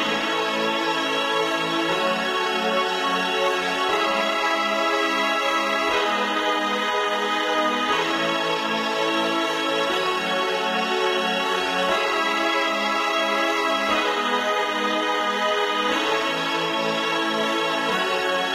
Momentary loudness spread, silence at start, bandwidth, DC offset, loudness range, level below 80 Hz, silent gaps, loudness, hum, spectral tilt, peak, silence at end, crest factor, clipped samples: 2 LU; 0 s; 16 kHz; under 0.1%; 1 LU; -62 dBFS; none; -22 LUFS; none; -2.5 dB/octave; -8 dBFS; 0 s; 14 dB; under 0.1%